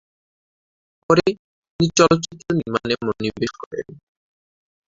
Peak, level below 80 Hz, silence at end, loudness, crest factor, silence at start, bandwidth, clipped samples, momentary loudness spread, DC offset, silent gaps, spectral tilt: -2 dBFS; -52 dBFS; 0.95 s; -20 LUFS; 22 dB; 1.1 s; 8 kHz; under 0.1%; 16 LU; under 0.1%; 1.39-1.62 s, 1.70-1.79 s, 3.66-3.71 s; -5 dB/octave